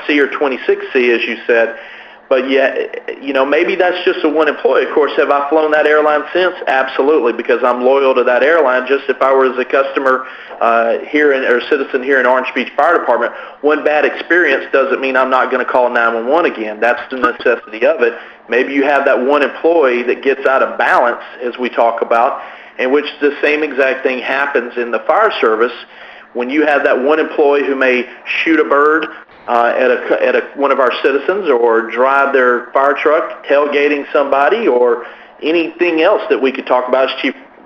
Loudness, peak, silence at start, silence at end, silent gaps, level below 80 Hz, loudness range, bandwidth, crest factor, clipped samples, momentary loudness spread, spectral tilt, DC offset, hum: -13 LUFS; 0 dBFS; 0 s; 0.2 s; none; -62 dBFS; 2 LU; 7 kHz; 14 dB; under 0.1%; 6 LU; -5 dB/octave; under 0.1%; none